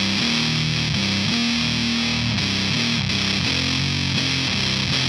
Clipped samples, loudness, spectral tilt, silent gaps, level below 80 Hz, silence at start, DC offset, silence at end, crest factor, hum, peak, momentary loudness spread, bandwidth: under 0.1%; -20 LUFS; -3.5 dB/octave; none; -42 dBFS; 0 s; under 0.1%; 0 s; 14 dB; none; -6 dBFS; 1 LU; 16 kHz